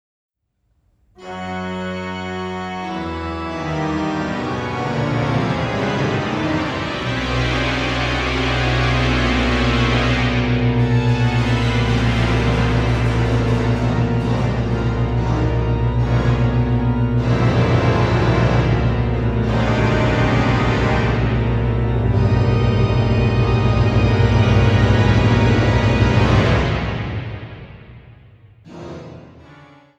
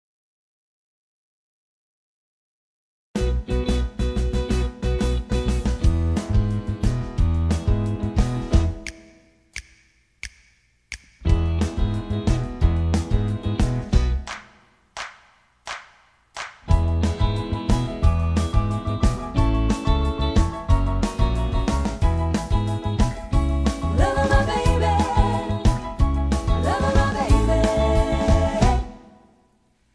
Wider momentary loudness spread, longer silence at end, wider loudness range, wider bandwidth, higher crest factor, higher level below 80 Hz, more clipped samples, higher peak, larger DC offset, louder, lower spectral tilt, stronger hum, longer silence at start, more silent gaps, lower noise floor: second, 10 LU vs 15 LU; second, 0.45 s vs 0.95 s; about the same, 8 LU vs 7 LU; second, 8 kHz vs 11 kHz; about the same, 16 dB vs 18 dB; about the same, -26 dBFS vs -24 dBFS; neither; about the same, -2 dBFS vs -4 dBFS; neither; first, -18 LUFS vs -23 LUFS; about the same, -7 dB/octave vs -6.5 dB/octave; neither; second, 1.2 s vs 3.15 s; neither; first, -66 dBFS vs -62 dBFS